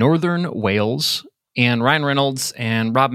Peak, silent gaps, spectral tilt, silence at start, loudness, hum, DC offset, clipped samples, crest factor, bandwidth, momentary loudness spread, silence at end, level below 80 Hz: 0 dBFS; none; -5 dB/octave; 0 s; -19 LUFS; none; under 0.1%; under 0.1%; 18 dB; 16 kHz; 5 LU; 0 s; -62 dBFS